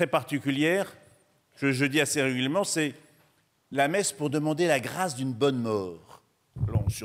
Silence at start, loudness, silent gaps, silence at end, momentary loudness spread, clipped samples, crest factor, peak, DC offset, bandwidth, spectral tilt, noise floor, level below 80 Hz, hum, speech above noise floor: 0 s; -27 LUFS; none; 0 s; 8 LU; under 0.1%; 18 dB; -10 dBFS; under 0.1%; 16 kHz; -4.5 dB/octave; -67 dBFS; -52 dBFS; none; 40 dB